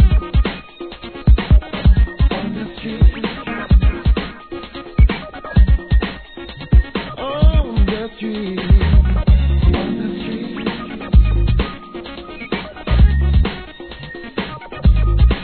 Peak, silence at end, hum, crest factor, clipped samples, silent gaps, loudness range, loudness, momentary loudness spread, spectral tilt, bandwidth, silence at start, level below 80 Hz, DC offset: 0 dBFS; 0 s; none; 14 dB; under 0.1%; none; 3 LU; -18 LUFS; 16 LU; -10.5 dB/octave; 4.5 kHz; 0 s; -16 dBFS; 0.3%